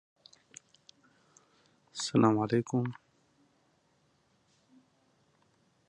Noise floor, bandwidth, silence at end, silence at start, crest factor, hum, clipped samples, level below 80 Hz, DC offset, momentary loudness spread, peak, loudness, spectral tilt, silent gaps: -71 dBFS; 10.5 kHz; 2.95 s; 1.95 s; 26 dB; none; under 0.1%; -74 dBFS; under 0.1%; 27 LU; -10 dBFS; -30 LUFS; -6 dB/octave; none